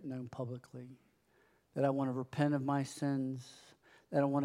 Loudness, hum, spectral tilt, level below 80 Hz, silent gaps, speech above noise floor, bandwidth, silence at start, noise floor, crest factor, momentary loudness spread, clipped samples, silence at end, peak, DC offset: -37 LUFS; none; -7.5 dB/octave; -80 dBFS; none; 36 dB; 12.5 kHz; 0 s; -71 dBFS; 20 dB; 18 LU; under 0.1%; 0 s; -18 dBFS; under 0.1%